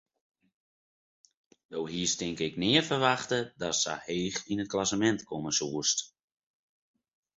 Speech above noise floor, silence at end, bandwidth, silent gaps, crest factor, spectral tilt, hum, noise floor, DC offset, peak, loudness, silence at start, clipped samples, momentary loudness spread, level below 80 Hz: over 60 dB; 1.3 s; 8.2 kHz; none; 24 dB; -3 dB/octave; none; under -90 dBFS; under 0.1%; -8 dBFS; -29 LUFS; 1.7 s; under 0.1%; 8 LU; -64 dBFS